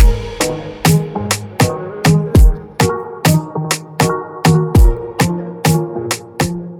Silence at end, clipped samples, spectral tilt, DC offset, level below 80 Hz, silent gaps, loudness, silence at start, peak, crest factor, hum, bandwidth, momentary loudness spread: 0 s; under 0.1%; -5.5 dB/octave; under 0.1%; -18 dBFS; none; -15 LUFS; 0 s; 0 dBFS; 14 dB; none; 18 kHz; 8 LU